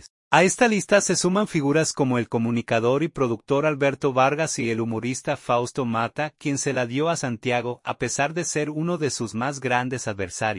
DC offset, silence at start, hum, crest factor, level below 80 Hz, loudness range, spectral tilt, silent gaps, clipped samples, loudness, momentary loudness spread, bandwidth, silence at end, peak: under 0.1%; 0.3 s; none; 20 dB; -60 dBFS; 4 LU; -4.5 dB/octave; none; under 0.1%; -23 LUFS; 8 LU; 11.5 kHz; 0 s; -2 dBFS